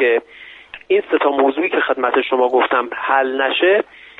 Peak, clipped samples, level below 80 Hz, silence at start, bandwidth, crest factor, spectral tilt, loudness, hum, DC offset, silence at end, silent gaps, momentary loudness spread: 0 dBFS; under 0.1%; -62 dBFS; 0 s; 4.1 kHz; 16 dB; -5.5 dB/octave; -16 LUFS; none; under 0.1%; 0.35 s; none; 4 LU